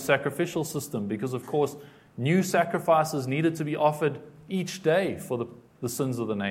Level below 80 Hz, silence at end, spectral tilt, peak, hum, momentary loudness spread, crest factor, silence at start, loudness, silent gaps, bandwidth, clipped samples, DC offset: -68 dBFS; 0 s; -5.5 dB/octave; -6 dBFS; none; 10 LU; 20 dB; 0 s; -27 LUFS; none; 16.5 kHz; under 0.1%; under 0.1%